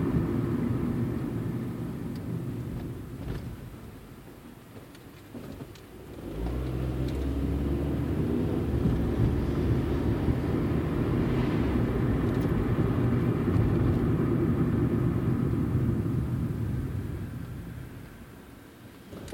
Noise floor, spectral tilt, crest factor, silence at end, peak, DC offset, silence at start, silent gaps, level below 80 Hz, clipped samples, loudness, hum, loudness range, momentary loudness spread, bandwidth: -48 dBFS; -9 dB/octave; 14 dB; 0 s; -14 dBFS; under 0.1%; 0 s; none; -38 dBFS; under 0.1%; -29 LUFS; none; 12 LU; 20 LU; 17 kHz